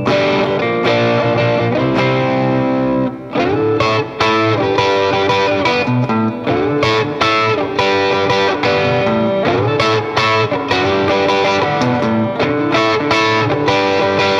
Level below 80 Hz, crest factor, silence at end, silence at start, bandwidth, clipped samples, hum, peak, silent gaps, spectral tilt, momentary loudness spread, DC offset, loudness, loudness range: -46 dBFS; 14 dB; 0 s; 0 s; 11 kHz; under 0.1%; none; 0 dBFS; none; -5.5 dB/octave; 2 LU; under 0.1%; -14 LUFS; 1 LU